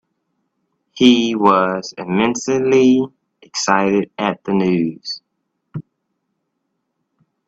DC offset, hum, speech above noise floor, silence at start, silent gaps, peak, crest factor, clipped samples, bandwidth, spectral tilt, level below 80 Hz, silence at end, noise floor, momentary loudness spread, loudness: under 0.1%; none; 57 dB; 0.95 s; none; 0 dBFS; 18 dB; under 0.1%; 8 kHz; -5 dB/octave; -60 dBFS; 1.65 s; -73 dBFS; 16 LU; -16 LUFS